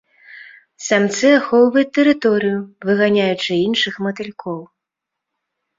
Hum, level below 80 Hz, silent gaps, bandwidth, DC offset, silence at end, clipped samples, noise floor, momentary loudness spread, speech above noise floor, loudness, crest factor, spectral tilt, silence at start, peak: none; -62 dBFS; none; 7.8 kHz; under 0.1%; 1.15 s; under 0.1%; -82 dBFS; 14 LU; 66 dB; -16 LUFS; 16 dB; -4.5 dB/octave; 0.3 s; -2 dBFS